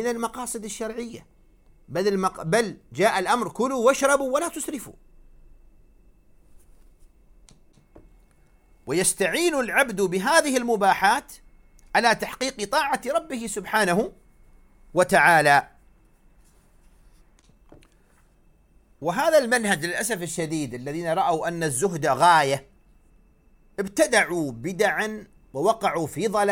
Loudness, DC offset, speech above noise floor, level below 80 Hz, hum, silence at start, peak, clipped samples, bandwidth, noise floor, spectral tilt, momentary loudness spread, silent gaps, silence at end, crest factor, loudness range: -23 LUFS; under 0.1%; 35 dB; -54 dBFS; none; 0 s; -4 dBFS; under 0.1%; 17.5 kHz; -58 dBFS; -3.5 dB/octave; 12 LU; none; 0 s; 22 dB; 6 LU